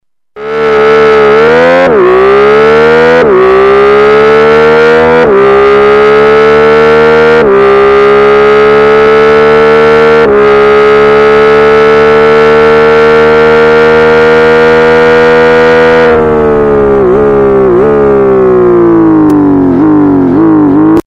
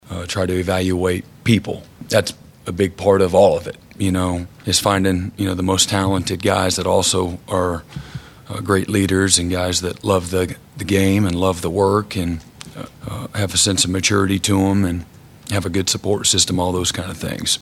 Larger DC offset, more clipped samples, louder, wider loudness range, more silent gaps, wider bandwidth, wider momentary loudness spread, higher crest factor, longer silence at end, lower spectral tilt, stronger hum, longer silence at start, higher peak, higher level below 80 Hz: first, 0.2% vs under 0.1%; neither; first, -4 LUFS vs -18 LUFS; about the same, 1 LU vs 2 LU; neither; second, 8 kHz vs 16.5 kHz; second, 2 LU vs 15 LU; second, 4 dB vs 18 dB; about the same, 0.1 s vs 0 s; first, -6.5 dB/octave vs -4 dB/octave; neither; first, 0.35 s vs 0.05 s; about the same, 0 dBFS vs 0 dBFS; first, -30 dBFS vs -44 dBFS